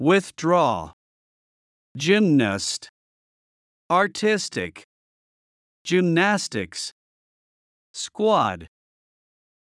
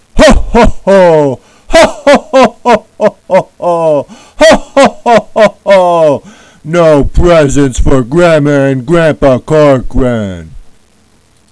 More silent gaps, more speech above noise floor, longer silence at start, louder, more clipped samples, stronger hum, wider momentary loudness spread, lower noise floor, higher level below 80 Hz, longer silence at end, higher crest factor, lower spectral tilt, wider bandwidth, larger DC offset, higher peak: first, 0.93-1.95 s, 2.89-3.89 s, 4.84-5.85 s, 6.92-7.94 s vs none; first, over 69 dB vs 41 dB; second, 0 s vs 0.15 s; second, -22 LUFS vs -7 LUFS; second, under 0.1% vs 5%; neither; first, 15 LU vs 7 LU; first, under -90 dBFS vs -47 dBFS; second, -66 dBFS vs -18 dBFS; about the same, 1 s vs 0.9 s; first, 18 dB vs 8 dB; about the same, -4.5 dB/octave vs -5.5 dB/octave; about the same, 12 kHz vs 11 kHz; neither; second, -6 dBFS vs 0 dBFS